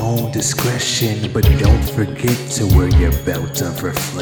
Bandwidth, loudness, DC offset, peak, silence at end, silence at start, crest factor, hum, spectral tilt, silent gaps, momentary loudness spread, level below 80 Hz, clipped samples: over 20 kHz; -16 LUFS; under 0.1%; 0 dBFS; 0 s; 0 s; 16 dB; none; -5 dB/octave; none; 8 LU; -22 dBFS; under 0.1%